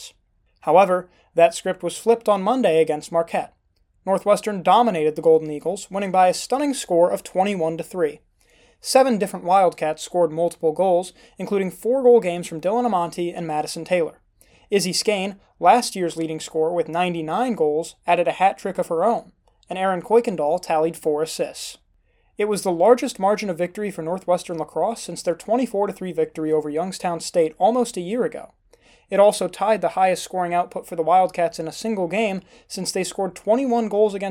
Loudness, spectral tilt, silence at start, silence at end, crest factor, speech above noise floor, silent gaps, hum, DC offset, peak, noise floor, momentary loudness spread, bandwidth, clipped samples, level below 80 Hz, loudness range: -21 LUFS; -4.5 dB/octave; 0 s; 0 s; 20 dB; 43 dB; none; none; under 0.1%; -2 dBFS; -64 dBFS; 10 LU; 16.5 kHz; under 0.1%; -62 dBFS; 3 LU